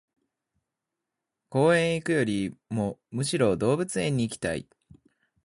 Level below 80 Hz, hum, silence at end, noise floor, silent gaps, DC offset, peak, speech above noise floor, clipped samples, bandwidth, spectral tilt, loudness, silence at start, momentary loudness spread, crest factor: -58 dBFS; none; 0.85 s; -86 dBFS; none; under 0.1%; -10 dBFS; 60 dB; under 0.1%; 11.5 kHz; -5.5 dB/octave; -27 LUFS; 1.5 s; 10 LU; 18 dB